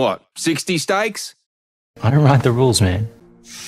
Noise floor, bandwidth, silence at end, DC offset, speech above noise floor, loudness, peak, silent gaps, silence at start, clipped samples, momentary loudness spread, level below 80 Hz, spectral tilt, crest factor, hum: -38 dBFS; 15 kHz; 0 s; under 0.1%; 22 dB; -17 LUFS; 0 dBFS; 1.46-1.94 s; 0 s; under 0.1%; 16 LU; -46 dBFS; -5.5 dB/octave; 18 dB; none